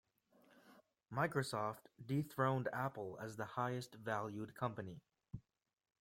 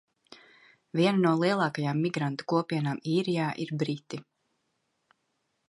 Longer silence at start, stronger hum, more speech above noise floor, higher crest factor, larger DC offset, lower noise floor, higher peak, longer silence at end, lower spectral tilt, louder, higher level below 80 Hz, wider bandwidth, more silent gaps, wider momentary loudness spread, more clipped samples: first, 0.65 s vs 0.3 s; neither; second, 30 dB vs 50 dB; about the same, 22 dB vs 18 dB; neither; second, -72 dBFS vs -78 dBFS; second, -22 dBFS vs -12 dBFS; second, 0.6 s vs 1.45 s; about the same, -6.5 dB/octave vs -7 dB/octave; second, -42 LUFS vs -28 LUFS; about the same, -76 dBFS vs -76 dBFS; first, 16.5 kHz vs 11.5 kHz; neither; first, 17 LU vs 9 LU; neither